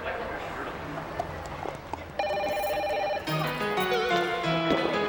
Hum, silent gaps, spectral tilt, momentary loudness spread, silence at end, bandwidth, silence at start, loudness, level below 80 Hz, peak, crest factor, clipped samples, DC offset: none; none; -5 dB/octave; 10 LU; 0 s; over 20 kHz; 0 s; -29 LUFS; -52 dBFS; -12 dBFS; 18 dB; under 0.1%; under 0.1%